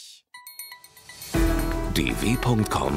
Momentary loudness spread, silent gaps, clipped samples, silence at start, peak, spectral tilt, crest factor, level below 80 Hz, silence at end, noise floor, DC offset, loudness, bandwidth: 21 LU; none; under 0.1%; 0 s; -8 dBFS; -5 dB/octave; 16 dB; -32 dBFS; 0 s; -46 dBFS; under 0.1%; -25 LUFS; 16 kHz